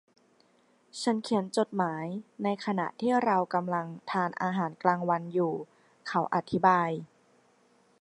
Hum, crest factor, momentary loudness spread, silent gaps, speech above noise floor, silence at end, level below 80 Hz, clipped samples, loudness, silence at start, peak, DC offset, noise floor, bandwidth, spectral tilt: none; 22 dB; 10 LU; none; 37 dB; 0.95 s; -74 dBFS; under 0.1%; -29 LUFS; 0.95 s; -8 dBFS; under 0.1%; -66 dBFS; 11.5 kHz; -6 dB/octave